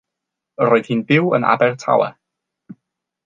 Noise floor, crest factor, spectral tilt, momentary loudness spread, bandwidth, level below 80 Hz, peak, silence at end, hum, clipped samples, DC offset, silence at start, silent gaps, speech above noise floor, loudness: -82 dBFS; 18 dB; -7 dB/octave; 4 LU; 7.6 kHz; -66 dBFS; -2 dBFS; 1.15 s; none; under 0.1%; under 0.1%; 0.6 s; none; 66 dB; -17 LUFS